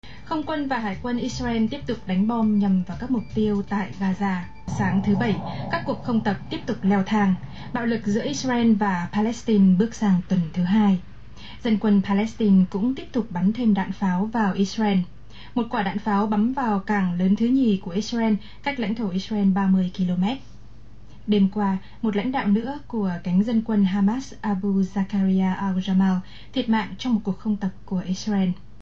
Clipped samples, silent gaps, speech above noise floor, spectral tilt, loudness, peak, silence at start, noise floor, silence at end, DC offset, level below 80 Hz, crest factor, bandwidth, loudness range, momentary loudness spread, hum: under 0.1%; none; 24 dB; -7 dB/octave; -23 LUFS; -8 dBFS; 0 s; -46 dBFS; 0.25 s; 1%; -48 dBFS; 14 dB; 7.4 kHz; 3 LU; 8 LU; none